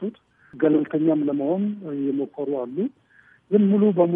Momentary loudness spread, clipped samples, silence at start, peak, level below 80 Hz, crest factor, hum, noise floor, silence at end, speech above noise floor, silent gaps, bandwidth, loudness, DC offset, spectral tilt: 10 LU; under 0.1%; 0 s; -6 dBFS; -76 dBFS; 16 dB; none; -47 dBFS; 0 s; 26 dB; none; 3.7 kHz; -23 LUFS; under 0.1%; -12 dB/octave